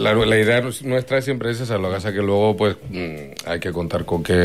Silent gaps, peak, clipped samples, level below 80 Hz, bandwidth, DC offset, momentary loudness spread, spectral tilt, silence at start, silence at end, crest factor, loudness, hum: none; -6 dBFS; under 0.1%; -46 dBFS; 15.5 kHz; 0.4%; 12 LU; -5.5 dB/octave; 0 s; 0 s; 14 dB; -21 LUFS; none